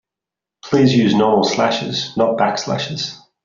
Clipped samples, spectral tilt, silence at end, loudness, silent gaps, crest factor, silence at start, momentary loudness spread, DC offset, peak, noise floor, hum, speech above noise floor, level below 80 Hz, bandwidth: under 0.1%; -4.5 dB/octave; 0.3 s; -17 LUFS; none; 14 dB; 0.65 s; 9 LU; under 0.1%; -2 dBFS; -86 dBFS; none; 70 dB; -56 dBFS; 7.6 kHz